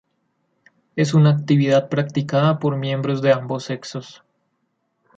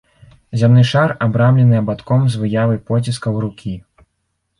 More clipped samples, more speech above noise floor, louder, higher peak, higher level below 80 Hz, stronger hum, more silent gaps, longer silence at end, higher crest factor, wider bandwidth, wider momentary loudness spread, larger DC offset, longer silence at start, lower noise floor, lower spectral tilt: neither; second, 52 dB vs 56 dB; second, -19 LUFS vs -15 LUFS; about the same, -4 dBFS vs -2 dBFS; second, -64 dBFS vs -48 dBFS; neither; neither; first, 1.05 s vs 0.8 s; about the same, 18 dB vs 14 dB; second, 7.8 kHz vs 11 kHz; about the same, 13 LU vs 13 LU; neither; first, 0.95 s vs 0.5 s; about the same, -71 dBFS vs -70 dBFS; about the same, -7 dB/octave vs -7.5 dB/octave